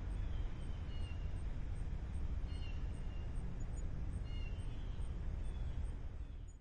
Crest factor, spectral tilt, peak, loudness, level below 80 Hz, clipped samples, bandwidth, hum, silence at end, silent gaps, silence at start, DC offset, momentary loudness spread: 10 dB; -7 dB/octave; -30 dBFS; -46 LUFS; -42 dBFS; under 0.1%; 9.2 kHz; none; 0 s; none; 0 s; under 0.1%; 2 LU